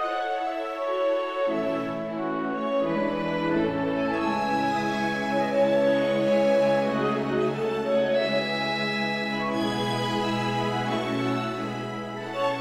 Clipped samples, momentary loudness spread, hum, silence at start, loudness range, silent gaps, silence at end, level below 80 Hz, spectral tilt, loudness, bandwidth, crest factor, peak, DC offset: under 0.1%; 7 LU; none; 0 s; 4 LU; none; 0 s; -58 dBFS; -6 dB/octave; -26 LUFS; 14 kHz; 14 dB; -12 dBFS; under 0.1%